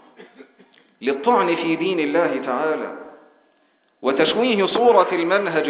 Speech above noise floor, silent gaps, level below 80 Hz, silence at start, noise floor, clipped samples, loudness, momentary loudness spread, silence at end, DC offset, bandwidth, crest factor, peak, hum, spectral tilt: 44 dB; none; -68 dBFS; 0.2 s; -62 dBFS; under 0.1%; -19 LUFS; 11 LU; 0 s; under 0.1%; 4 kHz; 18 dB; -2 dBFS; none; -9 dB/octave